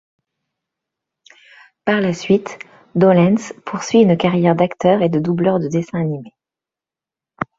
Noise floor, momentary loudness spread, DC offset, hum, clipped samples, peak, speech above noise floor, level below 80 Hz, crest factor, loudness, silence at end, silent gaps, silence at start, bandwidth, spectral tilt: -89 dBFS; 13 LU; under 0.1%; none; under 0.1%; -2 dBFS; 73 dB; -58 dBFS; 16 dB; -16 LUFS; 0.15 s; none; 1.85 s; 7.8 kHz; -7 dB/octave